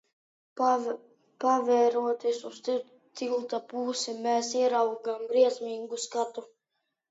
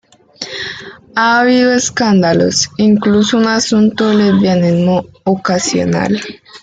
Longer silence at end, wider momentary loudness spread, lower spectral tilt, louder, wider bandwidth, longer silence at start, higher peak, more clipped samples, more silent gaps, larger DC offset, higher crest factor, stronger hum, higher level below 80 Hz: first, 0.65 s vs 0.05 s; about the same, 11 LU vs 12 LU; second, -2.5 dB/octave vs -4.5 dB/octave; second, -29 LUFS vs -12 LUFS; second, 8 kHz vs 9.2 kHz; first, 0.55 s vs 0.4 s; second, -12 dBFS vs 0 dBFS; neither; neither; neither; first, 18 dB vs 12 dB; neither; second, -88 dBFS vs -50 dBFS